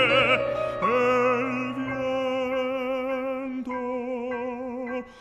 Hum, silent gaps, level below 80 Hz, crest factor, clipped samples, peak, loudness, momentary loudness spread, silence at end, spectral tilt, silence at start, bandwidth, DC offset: none; none; -56 dBFS; 16 dB; under 0.1%; -8 dBFS; -26 LUFS; 10 LU; 0 s; -5.5 dB/octave; 0 s; 9.2 kHz; under 0.1%